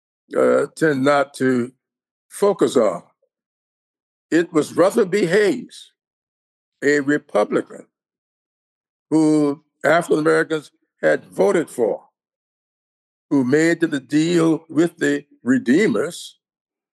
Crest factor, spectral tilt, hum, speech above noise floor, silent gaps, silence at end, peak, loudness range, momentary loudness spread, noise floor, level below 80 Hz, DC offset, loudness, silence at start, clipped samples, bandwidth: 16 dB; -5.5 dB/octave; none; over 72 dB; 2.11-2.29 s, 3.46-3.94 s, 4.02-4.29 s, 6.07-6.72 s, 8.18-8.81 s, 8.89-9.05 s, 12.36-13.29 s; 0.65 s; -4 dBFS; 4 LU; 8 LU; under -90 dBFS; -74 dBFS; under 0.1%; -19 LUFS; 0.3 s; under 0.1%; 12.5 kHz